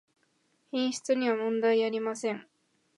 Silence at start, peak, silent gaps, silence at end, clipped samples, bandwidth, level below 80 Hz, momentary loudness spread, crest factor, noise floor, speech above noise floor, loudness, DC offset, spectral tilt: 0.75 s; -14 dBFS; none; 0.55 s; under 0.1%; 11.5 kHz; -86 dBFS; 9 LU; 16 dB; -72 dBFS; 44 dB; -29 LUFS; under 0.1%; -4 dB/octave